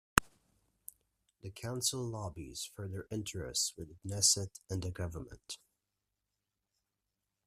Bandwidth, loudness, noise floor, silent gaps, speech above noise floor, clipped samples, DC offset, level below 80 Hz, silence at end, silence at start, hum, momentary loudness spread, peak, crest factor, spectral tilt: 15.5 kHz; -35 LUFS; -88 dBFS; none; 50 dB; under 0.1%; under 0.1%; -58 dBFS; 1.9 s; 0.15 s; none; 22 LU; -2 dBFS; 38 dB; -2.5 dB/octave